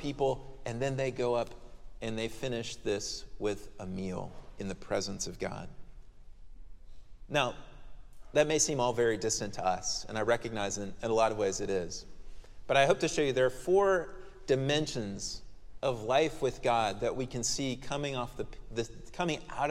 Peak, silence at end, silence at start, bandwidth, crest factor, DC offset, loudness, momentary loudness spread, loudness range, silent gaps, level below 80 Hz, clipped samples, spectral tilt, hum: -10 dBFS; 0 s; 0 s; 15 kHz; 22 dB; under 0.1%; -32 LUFS; 14 LU; 9 LU; none; -50 dBFS; under 0.1%; -4 dB/octave; none